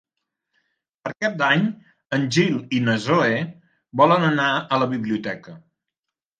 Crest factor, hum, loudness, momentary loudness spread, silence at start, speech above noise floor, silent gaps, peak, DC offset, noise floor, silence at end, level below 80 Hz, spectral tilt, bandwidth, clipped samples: 20 dB; none; -21 LUFS; 15 LU; 1.05 s; 66 dB; none; -2 dBFS; under 0.1%; -86 dBFS; 0.8 s; -66 dBFS; -5.5 dB/octave; 9.6 kHz; under 0.1%